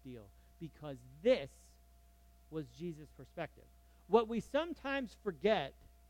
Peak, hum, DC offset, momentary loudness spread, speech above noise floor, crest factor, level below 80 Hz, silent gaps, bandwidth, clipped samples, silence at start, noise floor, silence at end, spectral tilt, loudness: -16 dBFS; none; under 0.1%; 19 LU; 26 dB; 24 dB; -62 dBFS; none; 17 kHz; under 0.1%; 0.05 s; -64 dBFS; 0.35 s; -6 dB/octave; -37 LUFS